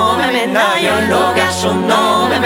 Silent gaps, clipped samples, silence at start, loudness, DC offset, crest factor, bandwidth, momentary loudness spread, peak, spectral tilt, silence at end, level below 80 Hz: none; under 0.1%; 0 s; -13 LUFS; under 0.1%; 12 dB; over 20 kHz; 2 LU; 0 dBFS; -4 dB/octave; 0 s; -46 dBFS